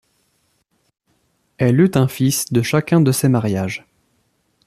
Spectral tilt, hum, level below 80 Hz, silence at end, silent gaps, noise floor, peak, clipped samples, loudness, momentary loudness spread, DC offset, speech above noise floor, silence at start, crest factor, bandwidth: -6 dB/octave; none; -54 dBFS; 0.9 s; none; -65 dBFS; -2 dBFS; under 0.1%; -17 LUFS; 8 LU; under 0.1%; 50 dB; 1.6 s; 16 dB; 14.5 kHz